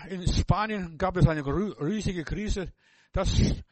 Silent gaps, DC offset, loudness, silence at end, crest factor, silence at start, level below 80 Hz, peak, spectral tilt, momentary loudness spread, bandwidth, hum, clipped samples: none; under 0.1%; -28 LUFS; 0.1 s; 20 dB; 0 s; -34 dBFS; -6 dBFS; -6 dB/octave; 9 LU; 8.4 kHz; none; under 0.1%